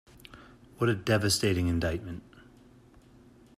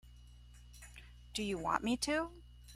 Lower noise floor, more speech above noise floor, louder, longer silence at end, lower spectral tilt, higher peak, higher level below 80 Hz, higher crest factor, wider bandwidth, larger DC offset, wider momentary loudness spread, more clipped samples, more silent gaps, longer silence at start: about the same, -56 dBFS vs -57 dBFS; first, 29 dB vs 21 dB; first, -28 LUFS vs -37 LUFS; first, 1.15 s vs 0 s; first, -5 dB/octave vs -3.5 dB/octave; first, -12 dBFS vs -16 dBFS; about the same, -52 dBFS vs -56 dBFS; second, 18 dB vs 24 dB; about the same, 15 kHz vs 16 kHz; neither; about the same, 25 LU vs 23 LU; neither; neither; first, 0.35 s vs 0.05 s